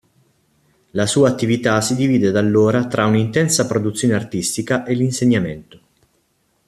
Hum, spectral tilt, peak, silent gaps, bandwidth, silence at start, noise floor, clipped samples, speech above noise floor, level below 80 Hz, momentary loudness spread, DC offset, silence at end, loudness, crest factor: none; -5 dB/octave; 0 dBFS; none; 14 kHz; 0.95 s; -64 dBFS; under 0.1%; 47 dB; -54 dBFS; 6 LU; under 0.1%; 1.05 s; -17 LUFS; 18 dB